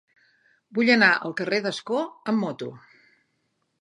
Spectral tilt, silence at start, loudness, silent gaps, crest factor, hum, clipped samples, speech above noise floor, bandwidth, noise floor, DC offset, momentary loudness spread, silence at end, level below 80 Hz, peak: -5 dB/octave; 0.7 s; -23 LUFS; none; 22 dB; none; under 0.1%; 50 dB; 11 kHz; -74 dBFS; under 0.1%; 15 LU; 1 s; -80 dBFS; -4 dBFS